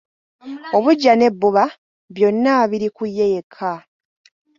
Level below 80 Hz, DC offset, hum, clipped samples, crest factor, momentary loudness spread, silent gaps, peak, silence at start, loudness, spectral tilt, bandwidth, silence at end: -64 dBFS; under 0.1%; none; under 0.1%; 16 dB; 16 LU; 1.78-2.08 s, 3.43-3.50 s; -2 dBFS; 0.45 s; -17 LUFS; -6 dB/octave; 7.4 kHz; 0.8 s